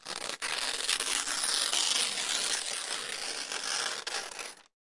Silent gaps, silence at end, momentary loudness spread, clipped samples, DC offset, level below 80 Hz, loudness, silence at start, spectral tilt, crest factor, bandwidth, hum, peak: none; 0.2 s; 9 LU; under 0.1%; under 0.1%; -68 dBFS; -30 LUFS; 0.05 s; 2 dB/octave; 24 dB; 11.5 kHz; none; -10 dBFS